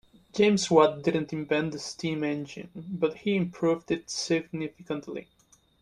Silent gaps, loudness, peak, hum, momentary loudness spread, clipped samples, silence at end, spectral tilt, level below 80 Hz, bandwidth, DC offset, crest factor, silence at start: none; -28 LUFS; -6 dBFS; none; 16 LU; under 0.1%; 0.6 s; -5 dB/octave; -64 dBFS; 11.5 kHz; under 0.1%; 22 dB; 0.35 s